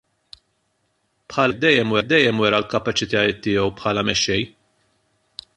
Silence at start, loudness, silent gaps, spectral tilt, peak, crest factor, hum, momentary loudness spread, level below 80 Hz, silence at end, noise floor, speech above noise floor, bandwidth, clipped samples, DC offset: 1.3 s; -19 LUFS; none; -4 dB/octave; -2 dBFS; 20 dB; none; 10 LU; -50 dBFS; 1.1 s; -69 dBFS; 50 dB; 11 kHz; under 0.1%; under 0.1%